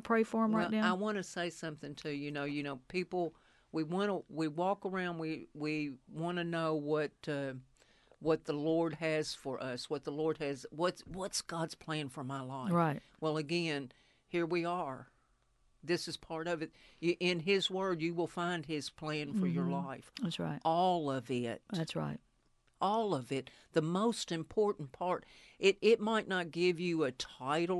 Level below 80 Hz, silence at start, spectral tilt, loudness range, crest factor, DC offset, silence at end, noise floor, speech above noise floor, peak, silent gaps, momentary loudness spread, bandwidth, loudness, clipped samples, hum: -70 dBFS; 0 s; -5.5 dB/octave; 5 LU; 20 dB; under 0.1%; 0 s; -73 dBFS; 37 dB; -16 dBFS; none; 9 LU; 12 kHz; -36 LUFS; under 0.1%; none